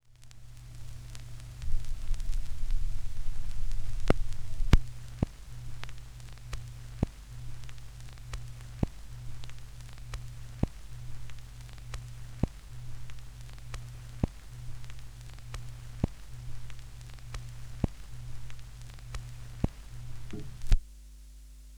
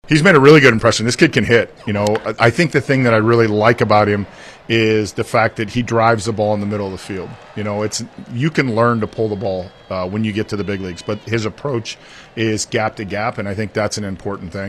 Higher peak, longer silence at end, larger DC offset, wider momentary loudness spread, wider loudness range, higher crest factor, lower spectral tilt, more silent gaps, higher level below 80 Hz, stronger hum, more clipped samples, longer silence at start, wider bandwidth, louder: second, -4 dBFS vs 0 dBFS; about the same, 0 s vs 0 s; neither; about the same, 14 LU vs 14 LU; about the same, 8 LU vs 8 LU; first, 28 dB vs 16 dB; about the same, -6 dB/octave vs -5.5 dB/octave; neither; first, -36 dBFS vs -46 dBFS; neither; neither; about the same, 0.1 s vs 0.05 s; second, 11 kHz vs 13 kHz; second, -40 LUFS vs -16 LUFS